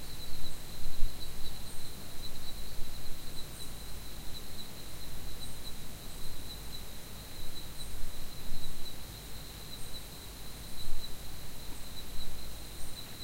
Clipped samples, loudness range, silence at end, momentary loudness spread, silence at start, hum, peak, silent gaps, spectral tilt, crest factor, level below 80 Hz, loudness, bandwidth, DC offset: under 0.1%; 1 LU; 0 s; 2 LU; 0 s; none; -10 dBFS; none; -3 dB/octave; 18 dB; -40 dBFS; -44 LUFS; 16 kHz; under 0.1%